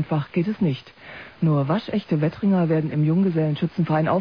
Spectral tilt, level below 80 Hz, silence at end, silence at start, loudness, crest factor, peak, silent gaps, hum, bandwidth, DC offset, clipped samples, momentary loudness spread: -10 dB/octave; -58 dBFS; 0 s; 0 s; -22 LUFS; 12 dB; -10 dBFS; none; none; 5.4 kHz; 0.1%; under 0.1%; 7 LU